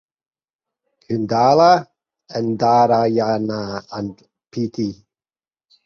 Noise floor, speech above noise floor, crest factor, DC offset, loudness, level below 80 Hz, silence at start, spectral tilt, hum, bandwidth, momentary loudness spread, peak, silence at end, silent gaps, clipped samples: under -90 dBFS; over 73 dB; 18 dB; under 0.1%; -18 LUFS; -58 dBFS; 1.1 s; -6.5 dB/octave; none; 6.8 kHz; 16 LU; -2 dBFS; 0.9 s; none; under 0.1%